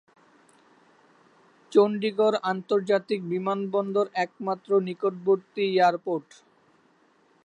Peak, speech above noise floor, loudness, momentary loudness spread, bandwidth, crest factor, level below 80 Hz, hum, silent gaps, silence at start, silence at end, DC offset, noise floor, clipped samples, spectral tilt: -8 dBFS; 38 dB; -25 LUFS; 7 LU; 9 kHz; 20 dB; -82 dBFS; none; none; 1.7 s; 1.25 s; under 0.1%; -63 dBFS; under 0.1%; -6.5 dB/octave